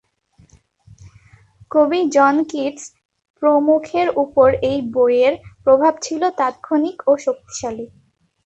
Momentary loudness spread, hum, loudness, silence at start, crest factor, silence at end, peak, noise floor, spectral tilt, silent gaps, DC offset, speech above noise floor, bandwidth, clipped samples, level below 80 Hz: 12 LU; none; -17 LUFS; 1.05 s; 16 dB; 0.6 s; -2 dBFS; -54 dBFS; -5 dB/octave; 3.05-3.09 s, 3.30-3.34 s; under 0.1%; 38 dB; 8.2 kHz; under 0.1%; -52 dBFS